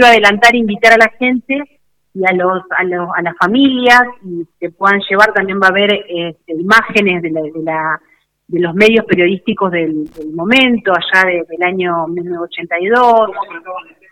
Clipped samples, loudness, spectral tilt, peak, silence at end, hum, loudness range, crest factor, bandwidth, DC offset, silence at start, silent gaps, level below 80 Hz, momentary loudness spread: 0.5%; -12 LUFS; -5 dB/octave; 0 dBFS; 0.3 s; none; 2 LU; 12 dB; 18.5 kHz; under 0.1%; 0 s; none; -52 dBFS; 14 LU